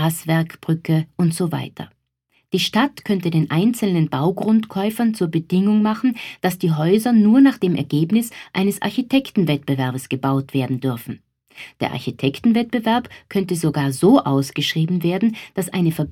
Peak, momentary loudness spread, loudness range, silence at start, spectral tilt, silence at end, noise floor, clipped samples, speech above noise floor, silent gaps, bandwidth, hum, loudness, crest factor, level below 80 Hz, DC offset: -2 dBFS; 10 LU; 5 LU; 0 s; -6.5 dB/octave; 0 s; -66 dBFS; under 0.1%; 47 dB; none; 17 kHz; none; -19 LUFS; 16 dB; -60 dBFS; under 0.1%